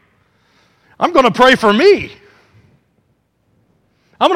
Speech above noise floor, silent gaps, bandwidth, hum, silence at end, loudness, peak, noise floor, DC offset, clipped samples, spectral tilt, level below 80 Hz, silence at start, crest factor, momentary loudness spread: 50 dB; none; 14.5 kHz; none; 0 s; -11 LUFS; 0 dBFS; -61 dBFS; under 0.1%; under 0.1%; -4.5 dB/octave; -50 dBFS; 1 s; 16 dB; 9 LU